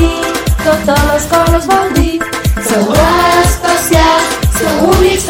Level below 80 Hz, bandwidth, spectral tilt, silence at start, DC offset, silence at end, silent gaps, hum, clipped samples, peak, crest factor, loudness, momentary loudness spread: -18 dBFS; 17 kHz; -4.5 dB/octave; 0 s; under 0.1%; 0 s; none; none; under 0.1%; 0 dBFS; 10 dB; -10 LUFS; 6 LU